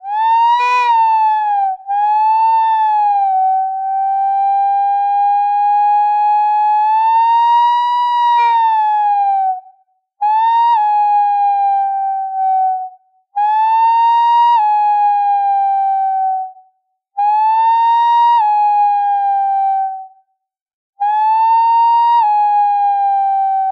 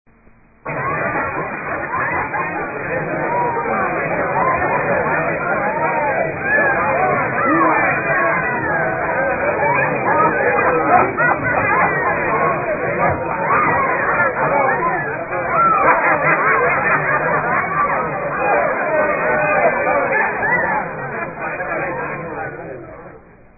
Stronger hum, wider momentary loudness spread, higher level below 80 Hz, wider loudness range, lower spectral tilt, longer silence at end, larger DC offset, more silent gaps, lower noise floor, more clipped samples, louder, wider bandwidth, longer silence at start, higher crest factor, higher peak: neither; about the same, 7 LU vs 9 LU; second, -82 dBFS vs -46 dBFS; second, 2 LU vs 5 LU; second, 4 dB/octave vs -14.5 dB/octave; second, 0 s vs 0.4 s; neither; first, 20.62-20.66 s, 20.74-20.93 s vs none; first, -71 dBFS vs -49 dBFS; neither; first, -13 LUFS vs -17 LUFS; first, 6.2 kHz vs 2.7 kHz; second, 0.05 s vs 0.65 s; second, 8 dB vs 16 dB; second, -6 dBFS vs 0 dBFS